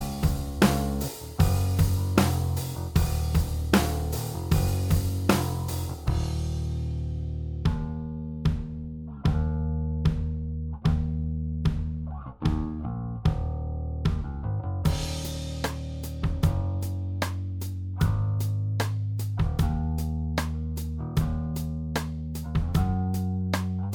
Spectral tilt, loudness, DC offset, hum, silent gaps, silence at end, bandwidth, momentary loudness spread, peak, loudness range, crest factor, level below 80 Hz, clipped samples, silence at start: -6.5 dB/octave; -28 LUFS; under 0.1%; none; none; 0 s; over 20 kHz; 8 LU; -4 dBFS; 4 LU; 24 dB; -34 dBFS; under 0.1%; 0 s